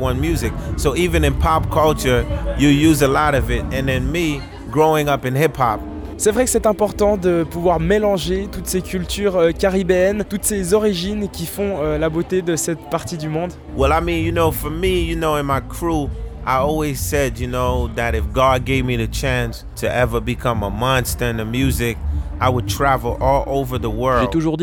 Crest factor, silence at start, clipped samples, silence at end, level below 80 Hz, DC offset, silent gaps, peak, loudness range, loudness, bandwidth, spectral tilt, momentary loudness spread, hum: 16 dB; 0 s; under 0.1%; 0 s; -28 dBFS; under 0.1%; none; -2 dBFS; 3 LU; -18 LUFS; over 20 kHz; -5.5 dB/octave; 7 LU; none